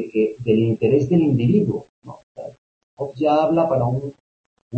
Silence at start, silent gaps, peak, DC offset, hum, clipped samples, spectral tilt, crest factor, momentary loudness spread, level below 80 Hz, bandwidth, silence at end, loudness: 0 s; 1.89-2.02 s, 2.23-2.35 s, 2.58-2.97 s, 4.20-4.71 s; -6 dBFS; under 0.1%; none; under 0.1%; -9.5 dB/octave; 16 dB; 20 LU; -54 dBFS; 7.8 kHz; 0 s; -19 LUFS